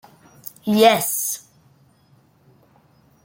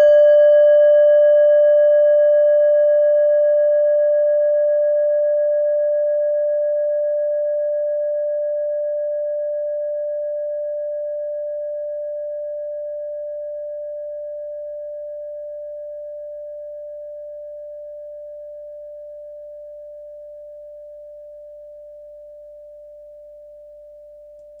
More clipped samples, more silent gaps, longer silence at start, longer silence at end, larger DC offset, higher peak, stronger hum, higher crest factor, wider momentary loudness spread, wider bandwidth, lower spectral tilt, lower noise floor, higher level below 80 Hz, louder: neither; neither; first, 0.65 s vs 0 s; first, 1.85 s vs 0 s; neither; first, -2 dBFS vs -6 dBFS; neither; first, 20 dB vs 12 dB; about the same, 22 LU vs 24 LU; first, 17 kHz vs 3.2 kHz; about the same, -3 dB/octave vs -3.5 dB/octave; first, -57 dBFS vs -42 dBFS; about the same, -68 dBFS vs -64 dBFS; about the same, -18 LUFS vs -17 LUFS